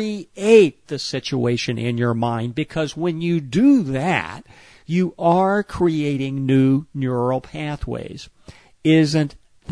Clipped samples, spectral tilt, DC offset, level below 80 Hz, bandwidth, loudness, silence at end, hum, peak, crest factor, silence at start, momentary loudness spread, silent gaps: under 0.1%; -6.5 dB/octave; 0.1%; -46 dBFS; 10.5 kHz; -20 LUFS; 0 s; none; 0 dBFS; 18 dB; 0 s; 12 LU; none